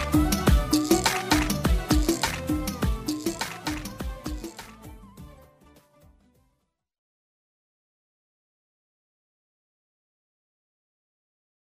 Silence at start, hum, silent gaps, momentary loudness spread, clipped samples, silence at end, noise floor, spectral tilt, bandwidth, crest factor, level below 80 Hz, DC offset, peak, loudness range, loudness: 0 s; none; none; 18 LU; under 0.1%; 6.35 s; -75 dBFS; -4.5 dB/octave; 15.5 kHz; 20 dB; -34 dBFS; under 0.1%; -8 dBFS; 18 LU; -26 LUFS